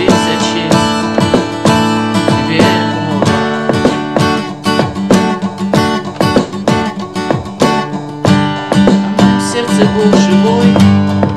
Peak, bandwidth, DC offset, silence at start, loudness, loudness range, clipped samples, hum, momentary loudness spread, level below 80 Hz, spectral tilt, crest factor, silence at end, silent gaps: 0 dBFS; 13.5 kHz; 0.5%; 0 s; -11 LUFS; 3 LU; under 0.1%; none; 6 LU; -38 dBFS; -5.5 dB/octave; 10 dB; 0 s; none